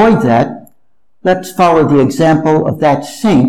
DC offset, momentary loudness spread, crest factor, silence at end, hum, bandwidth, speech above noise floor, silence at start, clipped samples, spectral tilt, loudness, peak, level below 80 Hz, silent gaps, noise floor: under 0.1%; 7 LU; 10 dB; 0 s; none; 15.5 kHz; 55 dB; 0 s; under 0.1%; -7 dB/octave; -11 LUFS; -2 dBFS; -42 dBFS; none; -65 dBFS